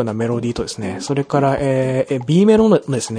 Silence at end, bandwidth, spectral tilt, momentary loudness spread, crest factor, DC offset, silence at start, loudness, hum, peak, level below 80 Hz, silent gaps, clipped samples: 0 s; 10.5 kHz; -6.5 dB/octave; 11 LU; 14 dB; under 0.1%; 0 s; -17 LUFS; none; -2 dBFS; -44 dBFS; none; under 0.1%